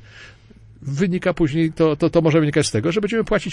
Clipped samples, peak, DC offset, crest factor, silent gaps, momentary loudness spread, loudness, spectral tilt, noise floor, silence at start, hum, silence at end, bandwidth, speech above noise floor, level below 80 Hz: under 0.1%; -4 dBFS; under 0.1%; 16 dB; none; 6 LU; -19 LUFS; -6 dB/octave; -46 dBFS; 0.15 s; none; 0 s; 11.5 kHz; 28 dB; -42 dBFS